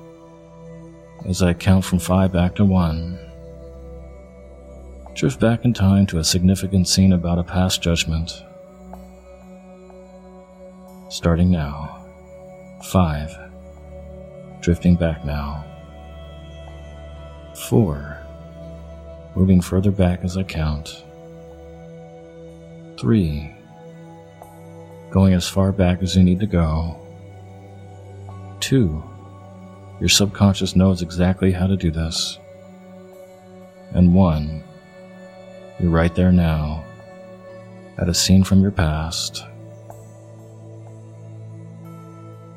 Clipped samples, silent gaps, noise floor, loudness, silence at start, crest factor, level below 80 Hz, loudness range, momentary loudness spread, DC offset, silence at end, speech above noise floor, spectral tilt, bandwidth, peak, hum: under 0.1%; none; -43 dBFS; -19 LUFS; 0 s; 20 dB; -36 dBFS; 8 LU; 24 LU; under 0.1%; 0 s; 25 dB; -5.5 dB/octave; 15.5 kHz; -2 dBFS; none